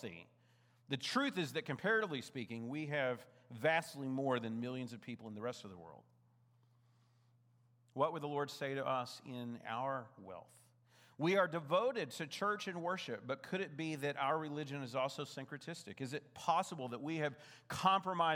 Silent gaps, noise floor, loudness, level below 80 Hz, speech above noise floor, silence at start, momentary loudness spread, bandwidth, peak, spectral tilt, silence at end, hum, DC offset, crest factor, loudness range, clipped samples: none; -72 dBFS; -40 LUFS; -86 dBFS; 32 dB; 0 s; 13 LU; 19 kHz; -18 dBFS; -5 dB/octave; 0 s; none; under 0.1%; 22 dB; 6 LU; under 0.1%